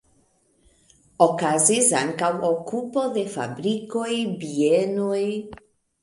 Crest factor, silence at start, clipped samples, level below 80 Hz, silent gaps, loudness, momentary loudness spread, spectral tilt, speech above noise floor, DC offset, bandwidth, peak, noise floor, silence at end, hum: 22 dB; 1.2 s; under 0.1%; -64 dBFS; none; -22 LUFS; 9 LU; -3.5 dB/octave; 41 dB; under 0.1%; 11.5 kHz; -2 dBFS; -63 dBFS; 0.45 s; none